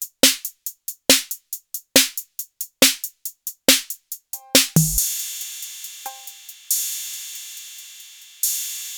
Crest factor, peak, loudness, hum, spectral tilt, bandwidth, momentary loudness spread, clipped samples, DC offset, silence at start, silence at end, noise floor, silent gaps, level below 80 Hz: 20 dB; -2 dBFS; -19 LUFS; none; -1.5 dB/octave; over 20 kHz; 18 LU; under 0.1%; under 0.1%; 0 s; 0 s; -43 dBFS; none; -46 dBFS